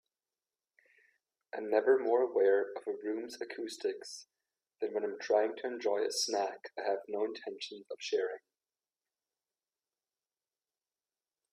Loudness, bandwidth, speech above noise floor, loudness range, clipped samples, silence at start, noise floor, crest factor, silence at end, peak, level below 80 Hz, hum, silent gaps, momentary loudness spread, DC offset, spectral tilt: -34 LUFS; 13.5 kHz; over 56 dB; 10 LU; under 0.1%; 1.55 s; under -90 dBFS; 20 dB; 3.15 s; -16 dBFS; -88 dBFS; none; none; 14 LU; under 0.1%; -2 dB/octave